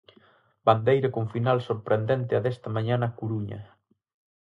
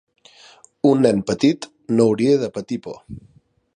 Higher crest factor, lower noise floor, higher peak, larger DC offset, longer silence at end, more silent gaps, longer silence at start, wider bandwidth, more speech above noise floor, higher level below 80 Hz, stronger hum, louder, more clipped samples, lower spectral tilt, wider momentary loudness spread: about the same, 20 dB vs 18 dB; first, -60 dBFS vs -49 dBFS; second, -6 dBFS vs -2 dBFS; neither; first, 0.8 s vs 0.55 s; neither; second, 0.65 s vs 0.85 s; second, 5.6 kHz vs 10.5 kHz; first, 35 dB vs 31 dB; second, -62 dBFS vs -56 dBFS; neither; second, -26 LUFS vs -19 LUFS; neither; first, -9 dB/octave vs -6.5 dB/octave; second, 9 LU vs 20 LU